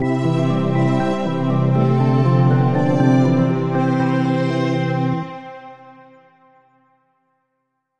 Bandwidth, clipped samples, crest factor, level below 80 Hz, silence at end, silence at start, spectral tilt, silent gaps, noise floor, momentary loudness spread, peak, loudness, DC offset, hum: 7.6 kHz; under 0.1%; 14 dB; -54 dBFS; 1.2 s; 0 s; -8.5 dB/octave; none; -73 dBFS; 7 LU; -4 dBFS; -17 LUFS; under 0.1%; none